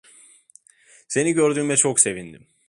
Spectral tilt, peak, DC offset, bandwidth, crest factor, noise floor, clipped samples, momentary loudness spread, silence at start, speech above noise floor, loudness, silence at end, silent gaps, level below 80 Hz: -3.5 dB/octave; 0 dBFS; under 0.1%; 11.5 kHz; 22 dB; -54 dBFS; under 0.1%; 9 LU; 1.1 s; 34 dB; -19 LUFS; 0.35 s; none; -64 dBFS